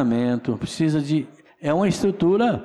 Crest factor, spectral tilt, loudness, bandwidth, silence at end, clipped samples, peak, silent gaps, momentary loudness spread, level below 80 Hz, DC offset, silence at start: 10 dB; -7 dB/octave; -22 LUFS; 12.5 kHz; 0 s; under 0.1%; -12 dBFS; none; 8 LU; -54 dBFS; under 0.1%; 0 s